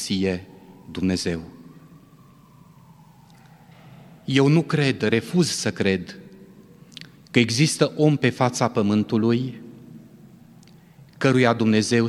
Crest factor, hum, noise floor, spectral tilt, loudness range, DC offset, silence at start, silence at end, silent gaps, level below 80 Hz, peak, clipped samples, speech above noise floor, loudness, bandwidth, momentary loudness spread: 22 dB; none; -51 dBFS; -5.5 dB/octave; 10 LU; under 0.1%; 0 s; 0 s; none; -60 dBFS; -2 dBFS; under 0.1%; 30 dB; -21 LUFS; 13.5 kHz; 22 LU